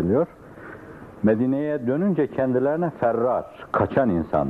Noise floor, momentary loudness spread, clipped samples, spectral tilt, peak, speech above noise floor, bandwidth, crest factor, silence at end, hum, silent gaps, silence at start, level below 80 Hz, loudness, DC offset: -41 dBFS; 19 LU; under 0.1%; -10 dB/octave; -8 dBFS; 19 dB; 4.7 kHz; 14 dB; 0 s; none; none; 0 s; -54 dBFS; -23 LUFS; under 0.1%